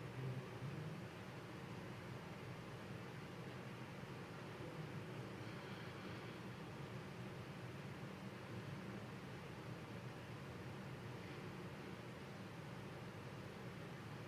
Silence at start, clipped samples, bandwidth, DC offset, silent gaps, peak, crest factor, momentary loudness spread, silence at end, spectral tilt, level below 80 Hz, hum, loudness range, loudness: 0 s; under 0.1%; 15 kHz; under 0.1%; none; -36 dBFS; 14 dB; 3 LU; 0 s; -6 dB/octave; -70 dBFS; none; 1 LU; -52 LUFS